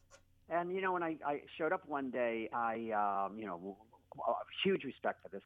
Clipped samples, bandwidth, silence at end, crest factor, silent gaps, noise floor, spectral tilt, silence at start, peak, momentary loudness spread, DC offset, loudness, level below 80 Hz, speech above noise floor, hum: under 0.1%; 7.4 kHz; 0.05 s; 18 dB; none; -64 dBFS; -7 dB/octave; 0.1 s; -22 dBFS; 9 LU; under 0.1%; -38 LUFS; -76 dBFS; 27 dB; none